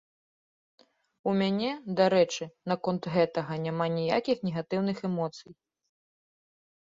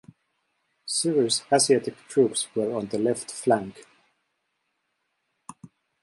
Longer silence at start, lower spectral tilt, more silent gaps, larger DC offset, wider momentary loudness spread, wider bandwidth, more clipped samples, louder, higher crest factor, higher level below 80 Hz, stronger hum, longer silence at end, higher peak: first, 1.25 s vs 0.85 s; first, -6 dB/octave vs -3.5 dB/octave; neither; neither; about the same, 8 LU vs 7 LU; second, 7.8 kHz vs 11.5 kHz; neither; second, -29 LUFS vs -24 LUFS; about the same, 20 dB vs 20 dB; about the same, -70 dBFS vs -72 dBFS; neither; first, 1.35 s vs 0.35 s; about the same, -10 dBFS vs -8 dBFS